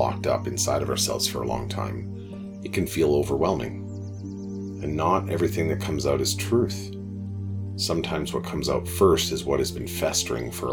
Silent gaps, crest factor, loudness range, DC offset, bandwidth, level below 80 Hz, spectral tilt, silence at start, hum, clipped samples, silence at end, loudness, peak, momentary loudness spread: none; 20 dB; 2 LU; under 0.1%; 19 kHz; -44 dBFS; -4.5 dB/octave; 0 s; none; under 0.1%; 0 s; -26 LUFS; -6 dBFS; 12 LU